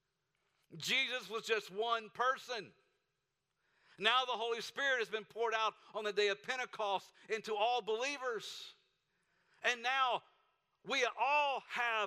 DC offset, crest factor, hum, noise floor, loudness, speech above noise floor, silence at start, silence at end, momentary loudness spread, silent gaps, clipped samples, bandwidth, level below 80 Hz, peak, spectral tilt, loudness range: under 0.1%; 22 dB; none; -87 dBFS; -36 LUFS; 50 dB; 0.7 s; 0 s; 10 LU; none; under 0.1%; 15.5 kHz; -88 dBFS; -16 dBFS; -1.5 dB/octave; 3 LU